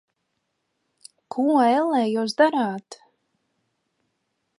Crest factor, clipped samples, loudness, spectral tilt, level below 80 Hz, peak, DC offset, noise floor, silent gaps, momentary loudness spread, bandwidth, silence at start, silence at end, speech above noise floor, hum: 20 dB; under 0.1%; -21 LUFS; -5 dB/octave; -80 dBFS; -6 dBFS; under 0.1%; -76 dBFS; none; 11 LU; 11.5 kHz; 1.35 s; 1.65 s; 55 dB; none